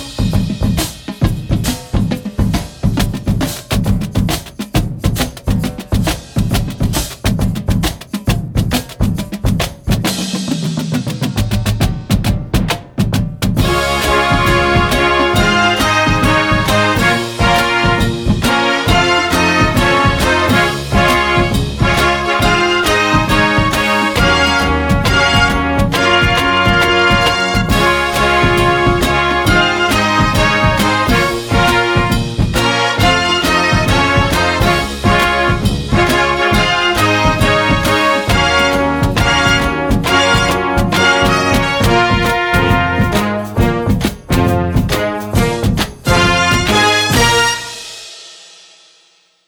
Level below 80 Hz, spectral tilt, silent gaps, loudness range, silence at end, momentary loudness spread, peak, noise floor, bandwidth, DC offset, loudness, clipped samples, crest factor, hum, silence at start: -24 dBFS; -4.5 dB/octave; none; 6 LU; 1.05 s; 7 LU; 0 dBFS; -52 dBFS; over 20 kHz; under 0.1%; -13 LUFS; under 0.1%; 14 dB; none; 0 s